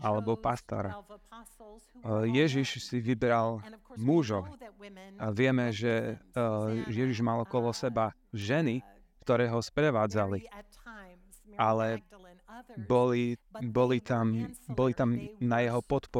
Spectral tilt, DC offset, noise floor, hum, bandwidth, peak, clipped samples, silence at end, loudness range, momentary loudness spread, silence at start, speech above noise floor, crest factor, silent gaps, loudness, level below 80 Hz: -7 dB/octave; under 0.1%; -55 dBFS; none; 14 kHz; -12 dBFS; under 0.1%; 0 s; 2 LU; 19 LU; 0 s; 25 dB; 18 dB; none; -31 LUFS; -58 dBFS